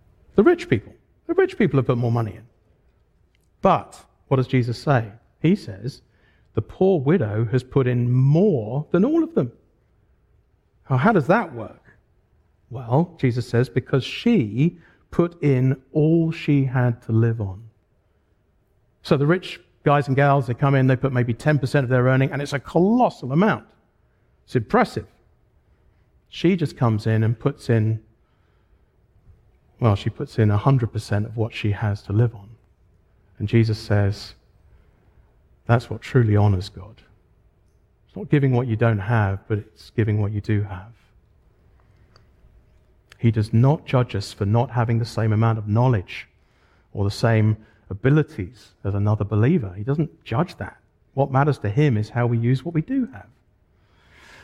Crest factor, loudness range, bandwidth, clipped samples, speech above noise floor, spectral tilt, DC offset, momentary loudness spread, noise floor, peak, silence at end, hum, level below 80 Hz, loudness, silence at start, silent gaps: 20 dB; 5 LU; 11.5 kHz; under 0.1%; 43 dB; -8.5 dB/octave; under 0.1%; 12 LU; -63 dBFS; -2 dBFS; 1.2 s; none; -52 dBFS; -21 LUFS; 0.35 s; none